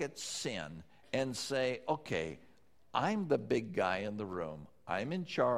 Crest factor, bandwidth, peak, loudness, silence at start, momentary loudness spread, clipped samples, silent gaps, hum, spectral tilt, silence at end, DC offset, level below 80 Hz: 20 dB; 15.5 kHz; -16 dBFS; -37 LUFS; 0 s; 11 LU; under 0.1%; none; none; -4.5 dB/octave; 0 s; under 0.1%; -68 dBFS